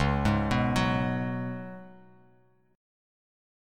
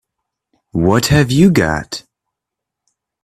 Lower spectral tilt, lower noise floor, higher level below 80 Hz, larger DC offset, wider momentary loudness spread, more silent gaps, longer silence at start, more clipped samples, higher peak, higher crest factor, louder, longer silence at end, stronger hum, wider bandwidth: about the same, -6.5 dB/octave vs -5.5 dB/octave; second, -64 dBFS vs -81 dBFS; about the same, -42 dBFS vs -38 dBFS; neither; about the same, 15 LU vs 15 LU; neither; second, 0 s vs 0.75 s; neither; second, -12 dBFS vs 0 dBFS; about the same, 18 dB vs 16 dB; second, -28 LUFS vs -13 LUFS; first, 1.8 s vs 1.25 s; neither; second, 13.5 kHz vs 15 kHz